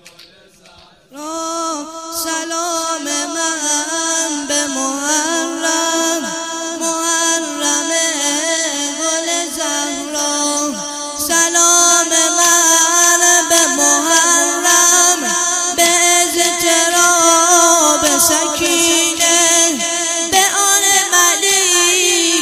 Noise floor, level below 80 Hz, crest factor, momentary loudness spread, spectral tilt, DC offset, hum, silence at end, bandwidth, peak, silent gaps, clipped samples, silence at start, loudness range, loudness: -45 dBFS; -54 dBFS; 14 dB; 11 LU; 0.5 dB/octave; under 0.1%; none; 0 s; 15.5 kHz; 0 dBFS; none; under 0.1%; 0.05 s; 8 LU; -12 LUFS